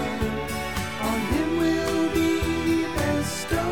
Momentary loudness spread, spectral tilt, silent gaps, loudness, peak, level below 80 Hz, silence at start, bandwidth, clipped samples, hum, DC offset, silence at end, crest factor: 5 LU; -5 dB/octave; none; -25 LUFS; -12 dBFS; -38 dBFS; 0 s; 18 kHz; under 0.1%; none; 0.7%; 0 s; 14 dB